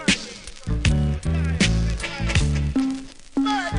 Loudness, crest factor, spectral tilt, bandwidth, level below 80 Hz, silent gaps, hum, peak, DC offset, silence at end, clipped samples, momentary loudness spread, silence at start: -23 LUFS; 16 dB; -5 dB/octave; 10.5 kHz; -28 dBFS; none; none; -6 dBFS; under 0.1%; 0 s; under 0.1%; 9 LU; 0 s